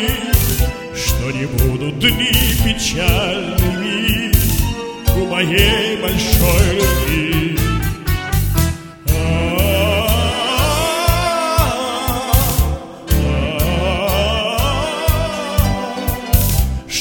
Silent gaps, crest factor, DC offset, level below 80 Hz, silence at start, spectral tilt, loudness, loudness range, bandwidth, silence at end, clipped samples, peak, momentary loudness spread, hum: none; 16 dB; under 0.1%; -20 dBFS; 0 s; -4.5 dB/octave; -16 LUFS; 2 LU; 19.5 kHz; 0 s; under 0.1%; 0 dBFS; 6 LU; none